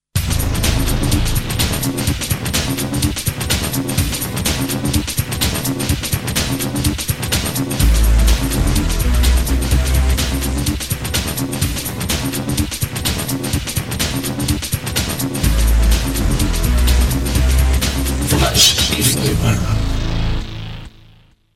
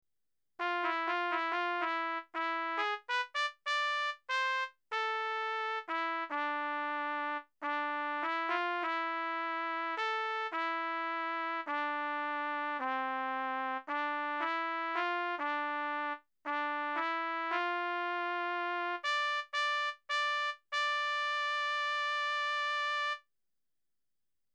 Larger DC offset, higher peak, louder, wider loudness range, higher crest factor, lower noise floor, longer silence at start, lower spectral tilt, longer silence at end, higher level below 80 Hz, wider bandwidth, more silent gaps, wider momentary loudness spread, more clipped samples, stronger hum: neither; first, 0 dBFS vs -18 dBFS; first, -17 LUFS vs -34 LUFS; first, 5 LU vs 2 LU; about the same, 16 dB vs 16 dB; second, -48 dBFS vs under -90 dBFS; second, 0.15 s vs 0.6 s; first, -4 dB/octave vs 0.5 dB/octave; second, 0.6 s vs 1.35 s; first, -20 dBFS vs under -90 dBFS; first, 16.5 kHz vs 11 kHz; neither; first, 6 LU vs 3 LU; neither; neither